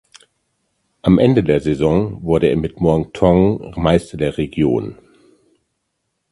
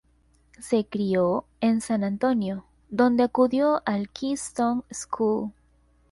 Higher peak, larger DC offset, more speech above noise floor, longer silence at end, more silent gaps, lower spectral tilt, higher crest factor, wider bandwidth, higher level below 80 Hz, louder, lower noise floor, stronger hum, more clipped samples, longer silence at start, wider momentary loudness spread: first, 0 dBFS vs -8 dBFS; neither; first, 57 dB vs 38 dB; first, 1.4 s vs 0.6 s; neither; first, -8 dB/octave vs -6 dB/octave; about the same, 18 dB vs 18 dB; about the same, 11.5 kHz vs 11.5 kHz; first, -36 dBFS vs -60 dBFS; first, -16 LUFS vs -25 LUFS; first, -72 dBFS vs -62 dBFS; neither; neither; first, 1.05 s vs 0.6 s; second, 8 LU vs 11 LU